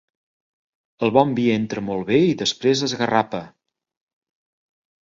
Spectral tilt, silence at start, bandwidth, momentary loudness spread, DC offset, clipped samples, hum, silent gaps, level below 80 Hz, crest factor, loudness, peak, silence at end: -5 dB/octave; 1 s; 7.8 kHz; 8 LU; under 0.1%; under 0.1%; none; none; -60 dBFS; 22 dB; -20 LUFS; 0 dBFS; 1.6 s